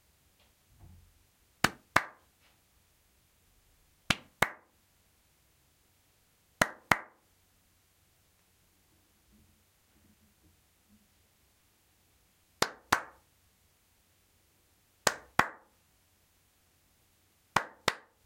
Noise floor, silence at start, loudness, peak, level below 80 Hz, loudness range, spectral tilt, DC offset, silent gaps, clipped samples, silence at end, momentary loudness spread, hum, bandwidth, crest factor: -69 dBFS; 1.65 s; -32 LUFS; -4 dBFS; -64 dBFS; 3 LU; -2.5 dB/octave; under 0.1%; none; under 0.1%; 0.3 s; 12 LU; none; 16.5 kHz; 36 dB